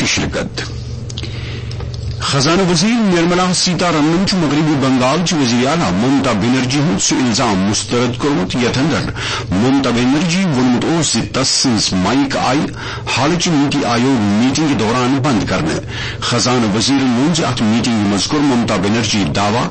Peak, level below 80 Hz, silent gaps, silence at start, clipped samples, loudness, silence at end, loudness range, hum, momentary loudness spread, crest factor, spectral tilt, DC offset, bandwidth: -4 dBFS; -36 dBFS; none; 0 s; under 0.1%; -14 LUFS; 0 s; 2 LU; none; 8 LU; 10 dB; -4.5 dB/octave; under 0.1%; 8.8 kHz